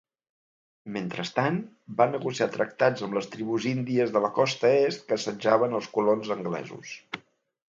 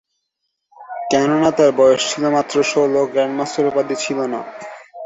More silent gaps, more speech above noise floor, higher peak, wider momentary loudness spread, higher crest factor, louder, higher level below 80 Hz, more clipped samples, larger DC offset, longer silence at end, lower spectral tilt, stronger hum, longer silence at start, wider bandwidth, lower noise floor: neither; first, over 64 dB vs 59 dB; second, -6 dBFS vs -2 dBFS; second, 13 LU vs 16 LU; about the same, 20 dB vs 16 dB; second, -27 LUFS vs -17 LUFS; second, -74 dBFS vs -60 dBFS; neither; neither; first, 0.55 s vs 0 s; first, -5.5 dB/octave vs -4 dB/octave; neither; about the same, 0.85 s vs 0.8 s; about the same, 7.8 kHz vs 8 kHz; first, under -90 dBFS vs -75 dBFS